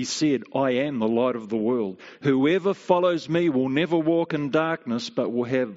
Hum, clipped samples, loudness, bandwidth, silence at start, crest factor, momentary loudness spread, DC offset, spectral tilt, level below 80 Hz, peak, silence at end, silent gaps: none; under 0.1%; -24 LUFS; 8 kHz; 0 s; 18 dB; 5 LU; under 0.1%; -5 dB/octave; -68 dBFS; -6 dBFS; 0 s; none